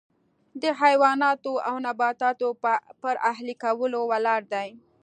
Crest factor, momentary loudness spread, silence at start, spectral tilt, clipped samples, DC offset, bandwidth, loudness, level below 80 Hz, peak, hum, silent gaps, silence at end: 20 dB; 10 LU; 0.55 s; -3.5 dB/octave; under 0.1%; under 0.1%; 9.4 kHz; -25 LUFS; -84 dBFS; -6 dBFS; none; none; 0.25 s